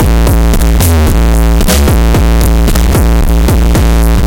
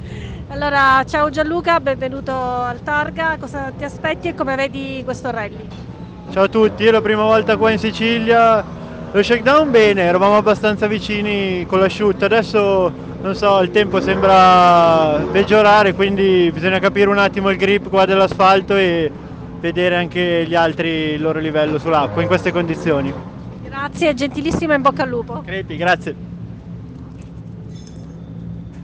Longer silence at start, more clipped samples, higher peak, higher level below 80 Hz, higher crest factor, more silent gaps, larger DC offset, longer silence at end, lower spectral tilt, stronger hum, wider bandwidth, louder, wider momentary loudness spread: about the same, 0 s vs 0 s; neither; about the same, 0 dBFS vs -2 dBFS; first, -8 dBFS vs -40 dBFS; second, 6 dB vs 12 dB; neither; first, 4% vs under 0.1%; about the same, 0 s vs 0 s; about the same, -5.5 dB/octave vs -6 dB/octave; neither; first, 17.5 kHz vs 9 kHz; first, -9 LUFS vs -15 LUFS; second, 1 LU vs 20 LU